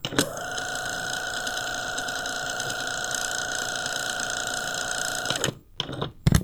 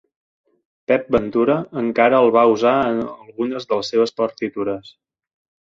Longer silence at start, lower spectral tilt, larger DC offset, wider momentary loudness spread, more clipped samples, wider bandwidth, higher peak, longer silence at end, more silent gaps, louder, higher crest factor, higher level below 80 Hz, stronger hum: second, 0 s vs 0.9 s; second, -2.5 dB/octave vs -6 dB/octave; neither; second, 3 LU vs 12 LU; neither; first, over 20 kHz vs 7.6 kHz; about the same, -4 dBFS vs -2 dBFS; second, 0 s vs 0.8 s; neither; second, -28 LUFS vs -18 LUFS; first, 24 dB vs 18 dB; first, -42 dBFS vs -54 dBFS; neither